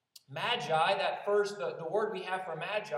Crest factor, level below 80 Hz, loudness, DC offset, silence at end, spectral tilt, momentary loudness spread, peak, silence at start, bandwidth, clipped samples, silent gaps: 16 dB; under -90 dBFS; -32 LUFS; under 0.1%; 0 s; -4 dB/octave; 8 LU; -16 dBFS; 0.15 s; 13.5 kHz; under 0.1%; none